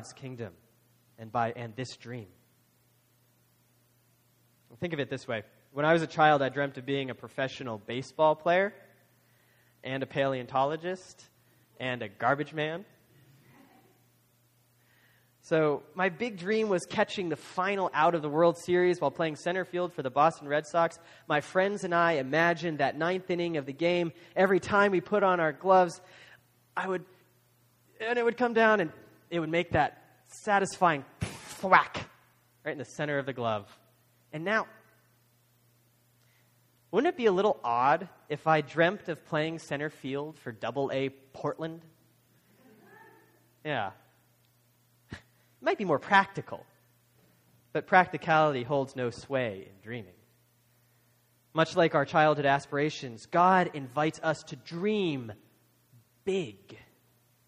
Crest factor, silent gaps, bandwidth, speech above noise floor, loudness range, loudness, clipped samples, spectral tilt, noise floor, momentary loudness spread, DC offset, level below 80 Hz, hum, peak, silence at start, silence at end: 26 dB; none; 15.5 kHz; 39 dB; 11 LU; -29 LUFS; under 0.1%; -5.5 dB/octave; -67 dBFS; 15 LU; under 0.1%; -68 dBFS; none; -4 dBFS; 0 s; 0.7 s